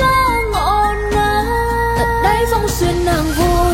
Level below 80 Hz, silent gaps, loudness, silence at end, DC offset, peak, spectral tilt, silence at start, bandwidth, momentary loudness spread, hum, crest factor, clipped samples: -22 dBFS; none; -15 LUFS; 0 s; under 0.1%; -2 dBFS; -5 dB/octave; 0 s; 16.5 kHz; 2 LU; none; 12 dB; under 0.1%